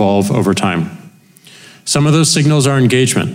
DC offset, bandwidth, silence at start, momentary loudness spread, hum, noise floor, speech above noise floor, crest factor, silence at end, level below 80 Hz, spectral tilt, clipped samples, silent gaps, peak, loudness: under 0.1%; 16.5 kHz; 0 s; 9 LU; none; -42 dBFS; 30 dB; 10 dB; 0 s; -50 dBFS; -5 dB/octave; under 0.1%; none; -2 dBFS; -12 LUFS